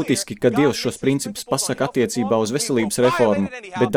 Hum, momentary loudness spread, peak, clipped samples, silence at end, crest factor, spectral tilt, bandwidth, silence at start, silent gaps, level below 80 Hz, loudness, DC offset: none; 6 LU; -4 dBFS; under 0.1%; 0 s; 16 dB; -4.5 dB/octave; 18 kHz; 0 s; none; -54 dBFS; -20 LUFS; under 0.1%